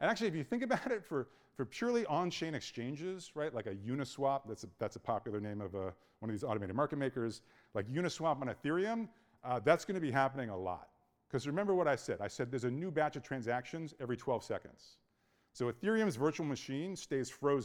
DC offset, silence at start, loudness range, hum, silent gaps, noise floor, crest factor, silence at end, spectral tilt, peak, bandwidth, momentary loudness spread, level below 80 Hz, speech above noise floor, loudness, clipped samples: under 0.1%; 0 s; 4 LU; none; none; -76 dBFS; 24 dB; 0 s; -6 dB/octave; -14 dBFS; 17 kHz; 10 LU; -72 dBFS; 39 dB; -38 LUFS; under 0.1%